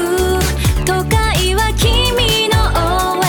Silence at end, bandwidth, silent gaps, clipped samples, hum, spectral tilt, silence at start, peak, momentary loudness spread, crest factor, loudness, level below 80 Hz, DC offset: 0 s; 19 kHz; none; under 0.1%; none; -4 dB/octave; 0 s; 0 dBFS; 3 LU; 12 dB; -14 LUFS; -20 dBFS; under 0.1%